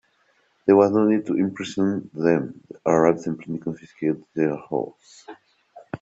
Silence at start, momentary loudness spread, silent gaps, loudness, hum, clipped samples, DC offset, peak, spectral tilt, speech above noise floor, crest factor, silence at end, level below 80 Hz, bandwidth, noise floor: 0.65 s; 13 LU; none; -22 LUFS; none; under 0.1%; under 0.1%; -4 dBFS; -7.5 dB/octave; 42 dB; 20 dB; 0.05 s; -64 dBFS; 8 kHz; -64 dBFS